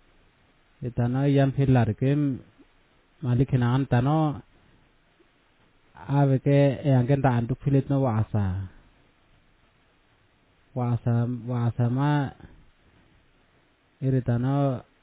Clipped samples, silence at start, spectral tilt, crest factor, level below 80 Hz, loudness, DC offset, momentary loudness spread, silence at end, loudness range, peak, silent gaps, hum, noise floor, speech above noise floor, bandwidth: under 0.1%; 0.8 s; -12.5 dB/octave; 18 dB; -50 dBFS; -25 LUFS; under 0.1%; 12 LU; 0.2 s; 6 LU; -8 dBFS; none; none; -63 dBFS; 40 dB; 4 kHz